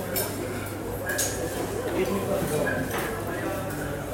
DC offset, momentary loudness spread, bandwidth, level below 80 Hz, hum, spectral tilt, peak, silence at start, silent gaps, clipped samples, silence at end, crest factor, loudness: under 0.1%; 5 LU; 16.5 kHz; -46 dBFS; none; -4.5 dB/octave; -12 dBFS; 0 s; none; under 0.1%; 0 s; 16 dB; -28 LUFS